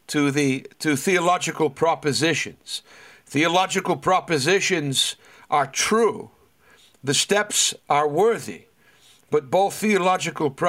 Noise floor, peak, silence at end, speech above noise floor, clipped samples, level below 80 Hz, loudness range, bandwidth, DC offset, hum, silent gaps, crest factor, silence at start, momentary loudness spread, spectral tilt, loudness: -56 dBFS; -6 dBFS; 0 s; 34 dB; under 0.1%; -66 dBFS; 1 LU; 16 kHz; under 0.1%; none; none; 16 dB; 0.1 s; 10 LU; -3 dB/octave; -21 LUFS